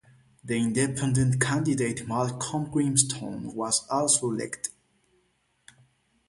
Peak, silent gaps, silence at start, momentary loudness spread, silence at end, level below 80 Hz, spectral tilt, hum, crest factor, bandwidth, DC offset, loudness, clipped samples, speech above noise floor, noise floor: -4 dBFS; none; 0.45 s; 11 LU; 1.6 s; -58 dBFS; -4 dB/octave; none; 24 dB; 11.5 kHz; under 0.1%; -26 LUFS; under 0.1%; 44 dB; -70 dBFS